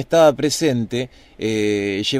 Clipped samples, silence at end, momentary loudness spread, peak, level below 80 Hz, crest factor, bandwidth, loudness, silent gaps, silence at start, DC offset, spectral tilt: under 0.1%; 0 s; 12 LU; -2 dBFS; -52 dBFS; 16 dB; 15.5 kHz; -19 LUFS; none; 0 s; under 0.1%; -4.5 dB/octave